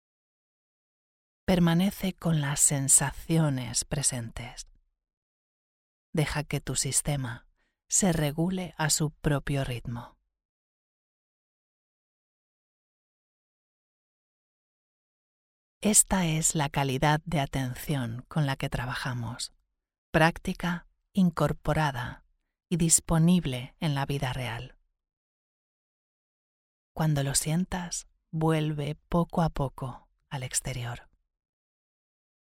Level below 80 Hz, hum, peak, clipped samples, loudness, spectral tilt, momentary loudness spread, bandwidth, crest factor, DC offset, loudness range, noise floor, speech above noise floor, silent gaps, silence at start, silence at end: -48 dBFS; none; -6 dBFS; under 0.1%; -27 LUFS; -4 dB/octave; 15 LU; 16 kHz; 24 dB; under 0.1%; 7 LU; under -90 dBFS; over 62 dB; 5.13-6.13 s, 10.45-15.81 s, 19.98-20.13 s, 25.17-26.95 s; 1.5 s; 1.4 s